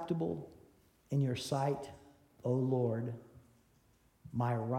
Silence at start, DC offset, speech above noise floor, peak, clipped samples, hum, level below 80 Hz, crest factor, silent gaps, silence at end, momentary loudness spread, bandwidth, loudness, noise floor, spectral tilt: 0 s; under 0.1%; 35 dB; -22 dBFS; under 0.1%; none; -70 dBFS; 16 dB; none; 0 s; 12 LU; 13.5 kHz; -36 LUFS; -69 dBFS; -7.5 dB/octave